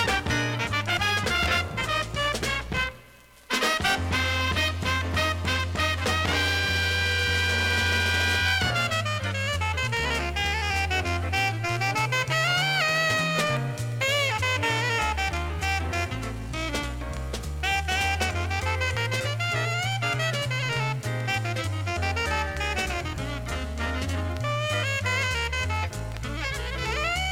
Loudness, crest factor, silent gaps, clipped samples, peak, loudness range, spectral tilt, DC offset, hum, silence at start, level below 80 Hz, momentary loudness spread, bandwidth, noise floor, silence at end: -25 LUFS; 16 dB; none; under 0.1%; -10 dBFS; 4 LU; -3.5 dB/octave; under 0.1%; none; 0 s; -38 dBFS; 7 LU; 16.5 kHz; -51 dBFS; 0 s